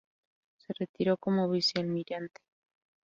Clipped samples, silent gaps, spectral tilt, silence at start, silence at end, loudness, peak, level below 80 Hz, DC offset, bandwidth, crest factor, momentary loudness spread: under 0.1%; 0.89-0.94 s; -6 dB/octave; 0.7 s; 0.8 s; -31 LUFS; -14 dBFS; -74 dBFS; under 0.1%; 7.6 kHz; 18 dB; 13 LU